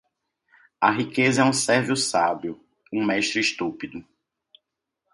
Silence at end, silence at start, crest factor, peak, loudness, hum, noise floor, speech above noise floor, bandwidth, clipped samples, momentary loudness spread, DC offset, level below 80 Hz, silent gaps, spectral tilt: 1.15 s; 0.8 s; 22 dB; -4 dBFS; -22 LUFS; none; -81 dBFS; 58 dB; 11.5 kHz; under 0.1%; 17 LU; under 0.1%; -64 dBFS; none; -3.5 dB/octave